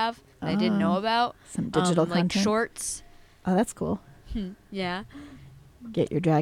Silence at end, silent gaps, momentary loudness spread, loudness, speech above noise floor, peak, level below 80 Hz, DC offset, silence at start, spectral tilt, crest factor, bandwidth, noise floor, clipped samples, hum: 0 s; none; 13 LU; -27 LUFS; 23 dB; -10 dBFS; -50 dBFS; under 0.1%; 0 s; -5.5 dB/octave; 18 dB; 14 kHz; -49 dBFS; under 0.1%; none